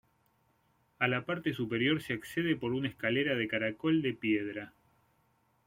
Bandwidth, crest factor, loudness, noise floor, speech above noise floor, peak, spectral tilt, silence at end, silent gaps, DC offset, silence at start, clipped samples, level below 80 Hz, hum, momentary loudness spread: 16 kHz; 20 dB; -32 LUFS; -72 dBFS; 40 dB; -14 dBFS; -6.5 dB/octave; 0.95 s; none; under 0.1%; 1 s; under 0.1%; -70 dBFS; none; 5 LU